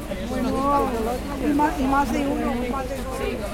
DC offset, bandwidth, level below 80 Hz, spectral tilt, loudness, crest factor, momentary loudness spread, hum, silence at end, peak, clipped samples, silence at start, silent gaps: under 0.1%; 16.5 kHz; -34 dBFS; -6 dB/octave; -24 LUFS; 16 dB; 7 LU; none; 0 s; -8 dBFS; under 0.1%; 0 s; none